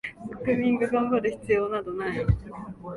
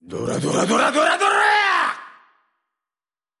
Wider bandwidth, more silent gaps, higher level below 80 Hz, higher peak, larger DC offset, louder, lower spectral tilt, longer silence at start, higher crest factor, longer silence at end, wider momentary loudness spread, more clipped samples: about the same, 11.5 kHz vs 11.5 kHz; neither; first, -40 dBFS vs -62 dBFS; second, -10 dBFS vs -6 dBFS; neither; second, -26 LUFS vs -18 LUFS; first, -8.5 dB/octave vs -3.5 dB/octave; about the same, 0.05 s vs 0.1 s; about the same, 16 dB vs 16 dB; second, 0 s vs 1.3 s; about the same, 11 LU vs 9 LU; neither